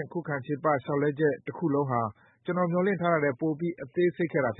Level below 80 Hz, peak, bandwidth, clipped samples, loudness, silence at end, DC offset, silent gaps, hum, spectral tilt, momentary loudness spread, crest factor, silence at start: -70 dBFS; -10 dBFS; 4 kHz; under 0.1%; -28 LUFS; 0.05 s; under 0.1%; none; none; -12 dB/octave; 7 LU; 18 dB; 0 s